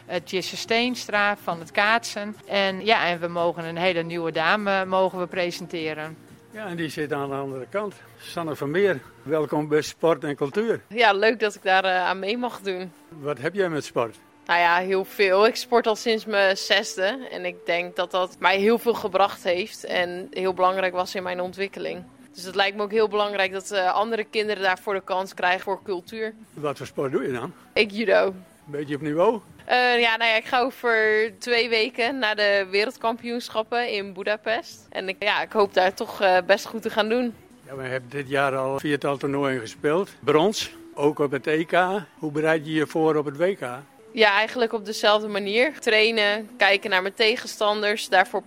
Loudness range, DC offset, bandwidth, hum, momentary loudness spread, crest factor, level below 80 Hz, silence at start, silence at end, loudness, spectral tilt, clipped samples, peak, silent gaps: 5 LU; under 0.1%; 16 kHz; none; 11 LU; 22 dB; -68 dBFS; 0.1 s; 0.05 s; -23 LUFS; -4 dB/octave; under 0.1%; -2 dBFS; none